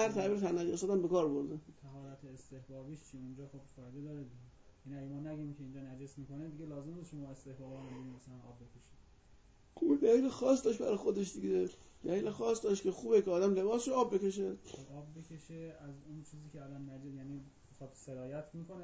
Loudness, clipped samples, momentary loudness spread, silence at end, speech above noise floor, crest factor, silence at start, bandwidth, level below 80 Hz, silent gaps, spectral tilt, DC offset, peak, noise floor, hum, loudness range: -35 LUFS; under 0.1%; 21 LU; 0 s; 25 dB; 20 dB; 0 s; 8 kHz; -68 dBFS; none; -6 dB/octave; under 0.1%; -18 dBFS; -63 dBFS; none; 16 LU